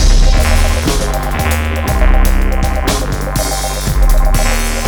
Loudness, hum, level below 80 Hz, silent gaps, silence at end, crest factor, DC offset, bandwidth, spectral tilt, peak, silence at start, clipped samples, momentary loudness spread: -14 LUFS; none; -12 dBFS; none; 0 s; 10 dB; under 0.1%; over 20 kHz; -4.5 dB/octave; -2 dBFS; 0 s; under 0.1%; 4 LU